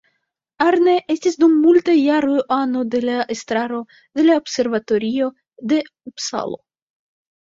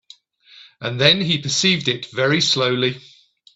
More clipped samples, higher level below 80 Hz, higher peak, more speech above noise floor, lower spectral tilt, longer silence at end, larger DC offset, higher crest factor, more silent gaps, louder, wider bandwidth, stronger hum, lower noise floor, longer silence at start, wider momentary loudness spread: neither; about the same, -62 dBFS vs -58 dBFS; about the same, -2 dBFS vs 0 dBFS; first, 55 dB vs 30 dB; about the same, -4 dB/octave vs -3.5 dB/octave; first, 0.9 s vs 0.55 s; neither; about the same, 16 dB vs 20 dB; neither; about the same, -18 LUFS vs -17 LUFS; about the same, 7.8 kHz vs 8.4 kHz; neither; first, -73 dBFS vs -49 dBFS; about the same, 0.6 s vs 0.55 s; about the same, 13 LU vs 11 LU